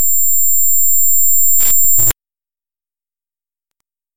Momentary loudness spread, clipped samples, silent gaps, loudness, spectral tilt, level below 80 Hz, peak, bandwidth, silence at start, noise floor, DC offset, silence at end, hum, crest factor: 3 LU; under 0.1%; none; -9 LUFS; 0 dB/octave; -44 dBFS; 0 dBFS; 17 kHz; 0 s; under -90 dBFS; under 0.1%; 0 s; none; 12 dB